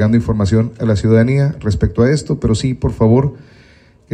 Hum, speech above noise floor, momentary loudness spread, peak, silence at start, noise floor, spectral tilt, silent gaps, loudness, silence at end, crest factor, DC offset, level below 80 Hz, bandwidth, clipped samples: none; 33 dB; 5 LU; -2 dBFS; 0 s; -46 dBFS; -7.5 dB/octave; none; -15 LUFS; 0.7 s; 12 dB; under 0.1%; -30 dBFS; 9.6 kHz; under 0.1%